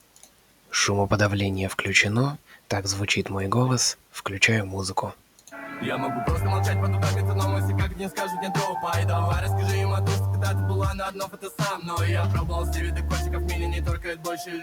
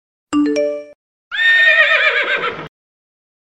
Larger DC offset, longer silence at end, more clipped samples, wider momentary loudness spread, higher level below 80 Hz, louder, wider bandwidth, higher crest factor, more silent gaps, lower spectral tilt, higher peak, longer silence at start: neither; second, 0 s vs 0.8 s; neither; second, 10 LU vs 16 LU; first, -38 dBFS vs -60 dBFS; second, -25 LUFS vs -13 LUFS; first, 17.5 kHz vs 9.8 kHz; first, 22 dB vs 16 dB; second, none vs 0.95-1.31 s; first, -4.5 dB/octave vs -3 dB/octave; about the same, -4 dBFS vs -2 dBFS; first, 0.7 s vs 0.3 s